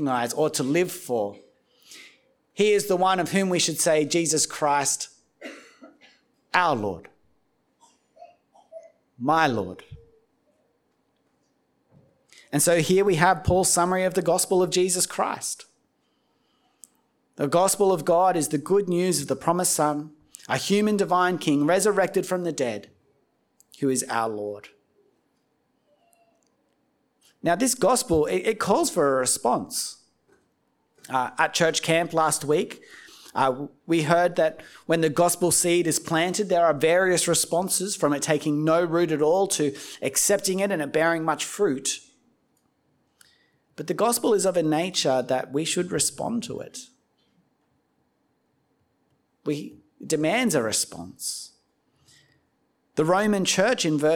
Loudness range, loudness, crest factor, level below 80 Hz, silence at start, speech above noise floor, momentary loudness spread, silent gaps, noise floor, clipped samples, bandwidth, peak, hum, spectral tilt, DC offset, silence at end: 9 LU; -23 LUFS; 22 dB; -58 dBFS; 0 s; 47 dB; 12 LU; none; -70 dBFS; under 0.1%; 19.5 kHz; -2 dBFS; none; -3.5 dB/octave; under 0.1%; 0 s